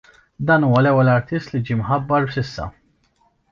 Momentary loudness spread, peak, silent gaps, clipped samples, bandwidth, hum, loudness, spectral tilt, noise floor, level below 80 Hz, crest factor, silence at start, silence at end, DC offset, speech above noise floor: 13 LU; -2 dBFS; none; under 0.1%; 7 kHz; none; -18 LUFS; -8.5 dB/octave; -62 dBFS; -46 dBFS; 16 dB; 0.4 s; 0.85 s; under 0.1%; 44 dB